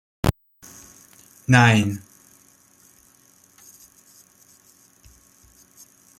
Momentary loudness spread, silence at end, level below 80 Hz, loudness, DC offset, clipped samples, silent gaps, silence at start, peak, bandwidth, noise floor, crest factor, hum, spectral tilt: 30 LU; 4.2 s; -46 dBFS; -19 LUFS; under 0.1%; under 0.1%; none; 0.25 s; -2 dBFS; 16.5 kHz; -56 dBFS; 24 dB; none; -5.5 dB/octave